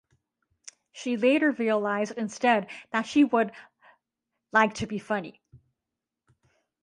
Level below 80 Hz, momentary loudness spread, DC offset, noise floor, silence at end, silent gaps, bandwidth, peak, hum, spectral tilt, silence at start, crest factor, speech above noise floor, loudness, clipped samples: -66 dBFS; 10 LU; under 0.1%; -87 dBFS; 1.25 s; none; 10.5 kHz; -6 dBFS; none; -5 dB/octave; 0.95 s; 22 dB; 62 dB; -26 LUFS; under 0.1%